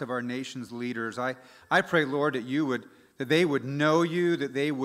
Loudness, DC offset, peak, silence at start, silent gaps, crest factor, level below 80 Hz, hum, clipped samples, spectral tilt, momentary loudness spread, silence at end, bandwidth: -28 LUFS; under 0.1%; -10 dBFS; 0 s; none; 18 dB; -76 dBFS; none; under 0.1%; -5.5 dB/octave; 11 LU; 0 s; 14.5 kHz